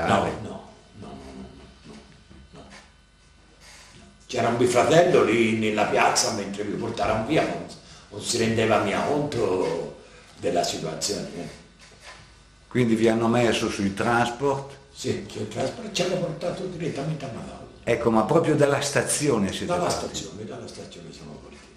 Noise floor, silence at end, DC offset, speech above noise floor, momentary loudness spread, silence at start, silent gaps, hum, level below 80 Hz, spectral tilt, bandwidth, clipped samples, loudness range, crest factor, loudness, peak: -55 dBFS; 0.1 s; under 0.1%; 31 dB; 20 LU; 0 s; none; none; -52 dBFS; -4.5 dB/octave; 14 kHz; under 0.1%; 8 LU; 22 dB; -24 LUFS; -2 dBFS